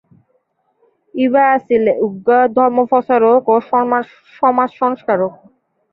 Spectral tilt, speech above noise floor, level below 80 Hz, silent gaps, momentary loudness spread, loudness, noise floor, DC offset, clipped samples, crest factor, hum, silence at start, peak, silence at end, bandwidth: -9 dB/octave; 50 dB; -62 dBFS; none; 7 LU; -14 LUFS; -63 dBFS; under 0.1%; under 0.1%; 14 dB; none; 1.15 s; -2 dBFS; 0.6 s; 4.2 kHz